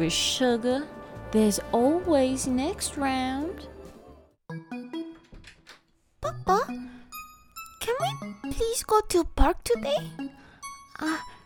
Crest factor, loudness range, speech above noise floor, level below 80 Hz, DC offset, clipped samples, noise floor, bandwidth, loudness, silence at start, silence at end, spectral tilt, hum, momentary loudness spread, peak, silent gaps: 22 dB; 8 LU; 35 dB; -40 dBFS; under 0.1%; under 0.1%; -60 dBFS; 18 kHz; -27 LUFS; 0 s; 0.1 s; -4 dB/octave; none; 19 LU; -6 dBFS; none